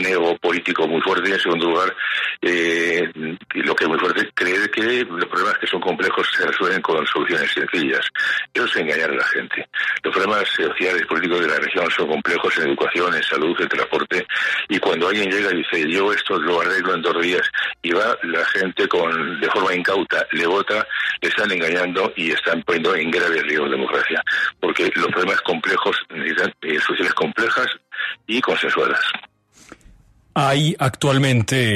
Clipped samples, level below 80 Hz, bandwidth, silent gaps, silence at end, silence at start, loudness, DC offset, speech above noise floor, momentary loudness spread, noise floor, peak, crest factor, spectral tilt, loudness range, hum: under 0.1%; -62 dBFS; 13.5 kHz; none; 0 s; 0 s; -19 LUFS; under 0.1%; 30 dB; 3 LU; -50 dBFS; -4 dBFS; 16 dB; -4.5 dB/octave; 1 LU; none